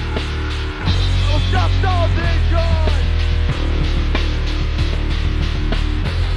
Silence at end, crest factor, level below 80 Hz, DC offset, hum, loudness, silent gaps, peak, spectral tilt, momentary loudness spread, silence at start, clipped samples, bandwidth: 0 s; 12 dB; -18 dBFS; under 0.1%; none; -19 LUFS; none; -4 dBFS; -6 dB/octave; 5 LU; 0 s; under 0.1%; 9.8 kHz